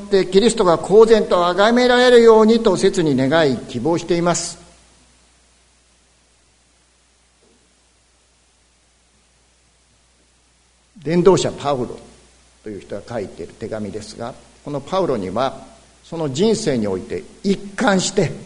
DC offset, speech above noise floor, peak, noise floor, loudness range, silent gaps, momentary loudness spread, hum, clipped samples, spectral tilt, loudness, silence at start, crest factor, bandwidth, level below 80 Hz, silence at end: under 0.1%; 41 dB; 0 dBFS; -57 dBFS; 14 LU; none; 20 LU; none; under 0.1%; -5 dB/octave; -16 LUFS; 0 s; 18 dB; 11 kHz; -46 dBFS; 0 s